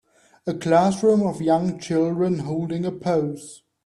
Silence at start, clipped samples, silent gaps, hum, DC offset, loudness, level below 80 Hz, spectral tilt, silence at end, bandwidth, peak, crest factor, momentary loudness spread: 0.45 s; under 0.1%; none; none; under 0.1%; -22 LUFS; -60 dBFS; -7 dB/octave; 0.3 s; 12 kHz; -6 dBFS; 16 dB; 12 LU